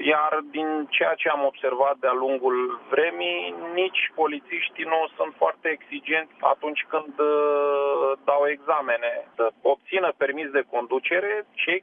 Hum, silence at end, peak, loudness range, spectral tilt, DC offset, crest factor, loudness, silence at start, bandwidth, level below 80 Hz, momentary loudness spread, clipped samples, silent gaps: none; 0 s; -4 dBFS; 2 LU; -6 dB/octave; under 0.1%; 20 dB; -24 LUFS; 0 s; 4.6 kHz; -86 dBFS; 5 LU; under 0.1%; none